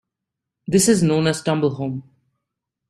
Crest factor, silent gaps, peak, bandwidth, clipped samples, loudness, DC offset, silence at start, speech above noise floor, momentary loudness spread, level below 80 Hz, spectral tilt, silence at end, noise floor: 18 dB; none; -4 dBFS; 15 kHz; under 0.1%; -19 LUFS; under 0.1%; 0.7 s; 65 dB; 15 LU; -56 dBFS; -5 dB/octave; 0.9 s; -83 dBFS